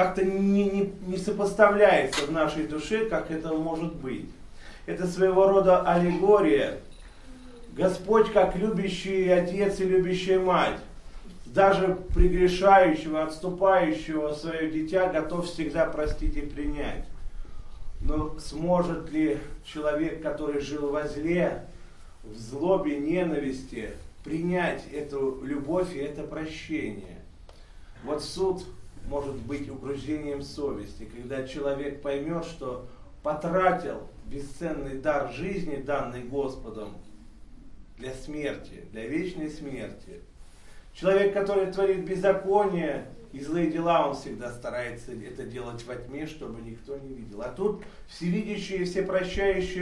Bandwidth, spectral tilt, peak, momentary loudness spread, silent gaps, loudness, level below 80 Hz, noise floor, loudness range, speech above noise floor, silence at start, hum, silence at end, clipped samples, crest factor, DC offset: 12 kHz; -6.5 dB/octave; -4 dBFS; 18 LU; none; -27 LUFS; -40 dBFS; -47 dBFS; 11 LU; 21 dB; 0 s; none; 0 s; under 0.1%; 24 dB; under 0.1%